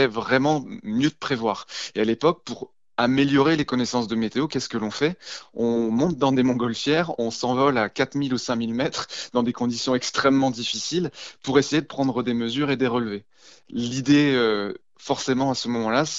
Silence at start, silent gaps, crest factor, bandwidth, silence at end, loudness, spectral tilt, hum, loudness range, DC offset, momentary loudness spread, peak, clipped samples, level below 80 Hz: 0 s; none; 18 dB; 8 kHz; 0 s; -23 LUFS; -5 dB/octave; none; 1 LU; 0.1%; 10 LU; -4 dBFS; under 0.1%; -58 dBFS